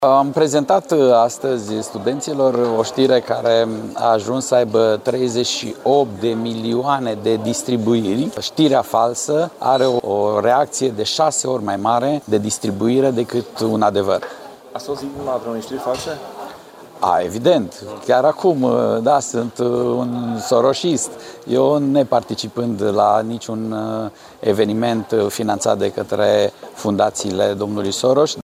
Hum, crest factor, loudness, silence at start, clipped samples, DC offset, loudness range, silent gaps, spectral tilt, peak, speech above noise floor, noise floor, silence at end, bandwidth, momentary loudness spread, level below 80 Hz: none; 14 dB; -18 LUFS; 0 s; under 0.1%; under 0.1%; 3 LU; none; -5 dB/octave; -2 dBFS; 22 dB; -39 dBFS; 0 s; 16 kHz; 9 LU; -60 dBFS